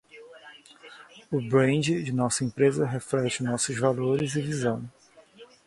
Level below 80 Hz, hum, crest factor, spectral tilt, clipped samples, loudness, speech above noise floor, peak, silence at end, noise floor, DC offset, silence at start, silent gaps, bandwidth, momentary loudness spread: -62 dBFS; none; 20 dB; -5 dB/octave; under 0.1%; -26 LUFS; 27 dB; -8 dBFS; 0.2 s; -52 dBFS; under 0.1%; 0.15 s; none; 11.5 kHz; 20 LU